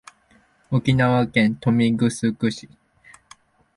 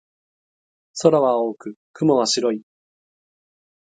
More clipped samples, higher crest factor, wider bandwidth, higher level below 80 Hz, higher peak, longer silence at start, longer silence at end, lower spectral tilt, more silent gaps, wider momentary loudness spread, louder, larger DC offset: neither; second, 16 dB vs 22 dB; first, 11.5 kHz vs 9.4 kHz; first, -54 dBFS vs -72 dBFS; second, -6 dBFS vs 0 dBFS; second, 0.7 s vs 0.95 s; about the same, 1.15 s vs 1.25 s; first, -6.5 dB/octave vs -4.5 dB/octave; second, none vs 1.76-1.94 s; second, 7 LU vs 19 LU; about the same, -20 LUFS vs -19 LUFS; neither